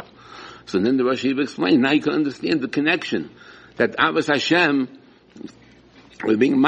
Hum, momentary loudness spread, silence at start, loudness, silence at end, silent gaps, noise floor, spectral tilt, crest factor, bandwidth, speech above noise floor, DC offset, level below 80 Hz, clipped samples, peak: none; 22 LU; 0 s; -20 LUFS; 0 s; none; -49 dBFS; -5.5 dB/octave; 20 dB; 8.6 kHz; 30 dB; under 0.1%; -62 dBFS; under 0.1%; -2 dBFS